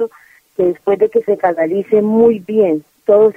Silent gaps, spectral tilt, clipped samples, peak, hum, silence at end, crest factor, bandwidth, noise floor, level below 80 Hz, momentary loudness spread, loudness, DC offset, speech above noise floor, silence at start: none; -9 dB/octave; under 0.1%; 0 dBFS; none; 0.05 s; 14 dB; 3.5 kHz; -47 dBFS; -56 dBFS; 7 LU; -14 LUFS; under 0.1%; 34 dB; 0 s